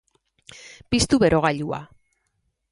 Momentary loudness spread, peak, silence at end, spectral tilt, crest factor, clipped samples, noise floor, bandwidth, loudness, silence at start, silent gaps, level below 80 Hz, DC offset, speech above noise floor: 25 LU; -4 dBFS; 0.85 s; -4.5 dB/octave; 20 dB; under 0.1%; -73 dBFS; 11.5 kHz; -21 LUFS; 0.65 s; none; -44 dBFS; under 0.1%; 53 dB